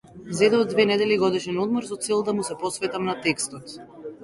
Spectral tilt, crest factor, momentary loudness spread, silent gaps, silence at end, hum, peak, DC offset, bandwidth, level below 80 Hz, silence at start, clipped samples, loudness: -4 dB/octave; 18 dB; 14 LU; none; 0 s; none; -6 dBFS; under 0.1%; 11.5 kHz; -62 dBFS; 0.15 s; under 0.1%; -23 LUFS